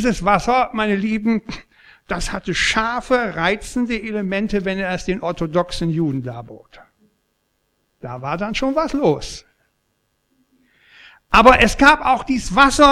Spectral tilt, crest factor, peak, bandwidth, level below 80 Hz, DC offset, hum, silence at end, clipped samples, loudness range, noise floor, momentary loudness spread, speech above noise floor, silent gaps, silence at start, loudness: -4.5 dB/octave; 18 dB; 0 dBFS; 15.5 kHz; -36 dBFS; under 0.1%; none; 0 s; under 0.1%; 9 LU; -68 dBFS; 16 LU; 51 dB; none; 0 s; -18 LUFS